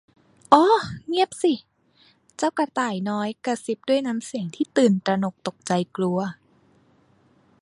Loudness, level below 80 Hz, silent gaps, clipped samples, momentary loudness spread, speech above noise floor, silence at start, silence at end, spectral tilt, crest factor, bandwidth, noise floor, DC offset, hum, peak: -23 LUFS; -64 dBFS; none; under 0.1%; 11 LU; 37 dB; 0.5 s; 1.3 s; -5.5 dB/octave; 24 dB; 11.5 kHz; -60 dBFS; under 0.1%; none; 0 dBFS